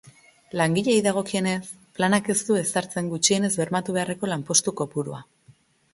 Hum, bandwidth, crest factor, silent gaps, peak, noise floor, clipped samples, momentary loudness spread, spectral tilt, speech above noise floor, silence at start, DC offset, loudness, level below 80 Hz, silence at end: none; 12 kHz; 22 dB; none; -4 dBFS; -57 dBFS; under 0.1%; 10 LU; -3.5 dB/octave; 33 dB; 0.05 s; under 0.1%; -23 LUFS; -64 dBFS; 0.7 s